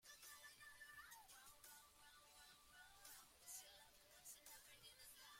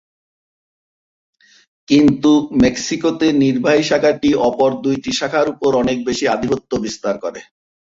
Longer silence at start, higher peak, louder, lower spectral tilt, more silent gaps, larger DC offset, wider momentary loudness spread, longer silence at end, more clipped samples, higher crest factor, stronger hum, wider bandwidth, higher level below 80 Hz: second, 0 s vs 1.9 s; second, -44 dBFS vs -2 dBFS; second, -62 LUFS vs -16 LUFS; second, 0.5 dB/octave vs -5 dB/octave; neither; neither; about the same, 8 LU vs 8 LU; second, 0 s vs 0.4 s; neither; first, 20 dB vs 14 dB; neither; first, 16.5 kHz vs 7.8 kHz; second, -84 dBFS vs -46 dBFS